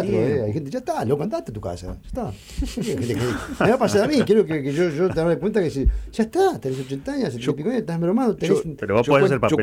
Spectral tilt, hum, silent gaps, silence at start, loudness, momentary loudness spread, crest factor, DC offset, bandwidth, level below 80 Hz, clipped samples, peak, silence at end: -6.5 dB/octave; none; none; 0 s; -22 LUFS; 13 LU; 14 dB; under 0.1%; 16 kHz; -36 dBFS; under 0.1%; -6 dBFS; 0 s